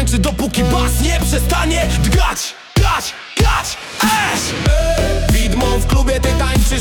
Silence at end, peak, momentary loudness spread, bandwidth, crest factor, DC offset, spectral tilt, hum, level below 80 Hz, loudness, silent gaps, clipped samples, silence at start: 0 s; -2 dBFS; 3 LU; 19 kHz; 12 dB; under 0.1%; -4.5 dB/octave; none; -18 dBFS; -16 LUFS; none; under 0.1%; 0 s